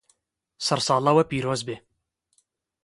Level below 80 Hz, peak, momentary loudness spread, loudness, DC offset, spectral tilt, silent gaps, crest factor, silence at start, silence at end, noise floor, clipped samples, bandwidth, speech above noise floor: -62 dBFS; -6 dBFS; 14 LU; -23 LUFS; under 0.1%; -4.5 dB/octave; none; 20 dB; 0.6 s; 1.05 s; -75 dBFS; under 0.1%; 11.5 kHz; 52 dB